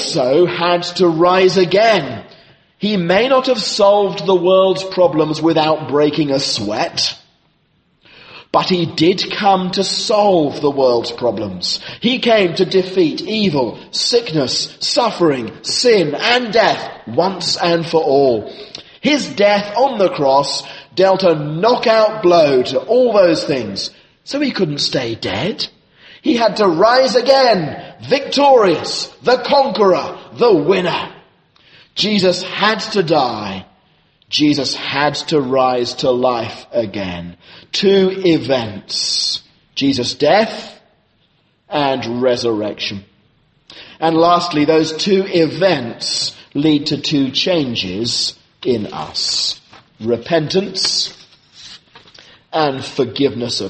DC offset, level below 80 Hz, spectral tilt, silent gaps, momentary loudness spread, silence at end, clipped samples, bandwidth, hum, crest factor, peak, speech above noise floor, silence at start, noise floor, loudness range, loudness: under 0.1%; -56 dBFS; -4.5 dB/octave; none; 10 LU; 0 s; under 0.1%; 8.8 kHz; none; 16 dB; 0 dBFS; 44 dB; 0 s; -59 dBFS; 5 LU; -15 LUFS